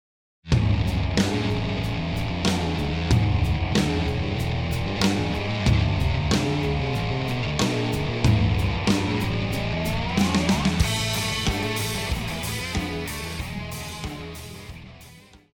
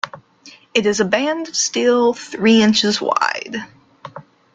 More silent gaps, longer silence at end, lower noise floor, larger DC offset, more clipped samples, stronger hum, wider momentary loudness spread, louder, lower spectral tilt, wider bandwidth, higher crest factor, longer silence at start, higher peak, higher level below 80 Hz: neither; second, 0.2 s vs 0.35 s; about the same, -48 dBFS vs -46 dBFS; neither; neither; neither; second, 10 LU vs 17 LU; second, -24 LUFS vs -16 LUFS; first, -5.5 dB/octave vs -3 dB/octave; first, 19 kHz vs 9.4 kHz; about the same, 18 dB vs 18 dB; first, 0.45 s vs 0.05 s; second, -6 dBFS vs -2 dBFS; first, -34 dBFS vs -60 dBFS